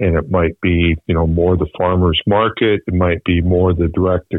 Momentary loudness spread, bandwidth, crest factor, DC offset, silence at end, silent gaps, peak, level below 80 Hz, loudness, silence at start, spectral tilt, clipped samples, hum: 3 LU; 4 kHz; 10 dB; under 0.1%; 0 s; none; -4 dBFS; -28 dBFS; -15 LUFS; 0 s; -10 dB/octave; under 0.1%; none